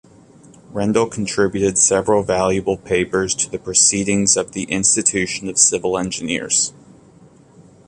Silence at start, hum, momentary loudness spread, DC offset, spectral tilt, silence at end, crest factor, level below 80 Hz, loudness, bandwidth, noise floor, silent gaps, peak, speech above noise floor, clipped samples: 0.7 s; none; 8 LU; under 0.1%; -2.5 dB/octave; 1.2 s; 20 dB; -48 dBFS; -17 LUFS; 11.5 kHz; -47 dBFS; none; 0 dBFS; 29 dB; under 0.1%